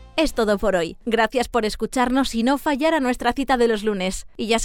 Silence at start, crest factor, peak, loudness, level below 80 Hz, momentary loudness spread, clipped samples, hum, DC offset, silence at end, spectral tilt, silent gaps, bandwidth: 0 s; 14 dB; -6 dBFS; -21 LUFS; -38 dBFS; 4 LU; under 0.1%; none; under 0.1%; 0 s; -4 dB/octave; none; 17 kHz